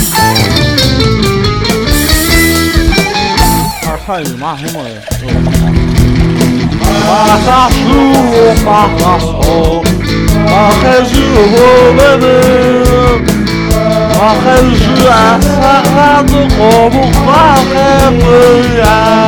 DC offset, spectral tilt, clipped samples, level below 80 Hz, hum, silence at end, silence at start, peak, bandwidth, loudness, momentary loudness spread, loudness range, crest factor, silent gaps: under 0.1%; -5 dB/octave; 2%; -16 dBFS; none; 0 s; 0 s; 0 dBFS; 19.5 kHz; -7 LUFS; 6 LU; 5 LU; 6 dB; none